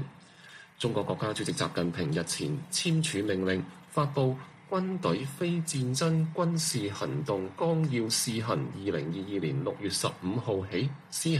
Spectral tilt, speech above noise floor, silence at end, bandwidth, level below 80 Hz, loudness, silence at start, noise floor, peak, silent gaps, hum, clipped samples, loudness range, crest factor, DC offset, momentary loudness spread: -5 dB/octave; 22 dB; 0 s; 14.5 kHz; -66 dBFS; -31 LUFS; 0 s; -52 dBFS; -14 dBFS; none; none; under 0.1%; 2 LU; 16 dB; under 0.1%; 6 LU